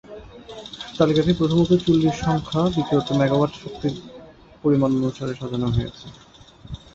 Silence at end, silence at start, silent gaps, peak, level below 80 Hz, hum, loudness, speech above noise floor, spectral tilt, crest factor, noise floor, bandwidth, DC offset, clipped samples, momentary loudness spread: 0.2 s; 0.1 s; none; -4 dBFS; -44 dBFS; none; -21 LUFS; 24 dB; -7.5 dB/octave; 18 dB; -45 dBFS; 8 kHz; under 0.1%; under 0.1%; 21 LU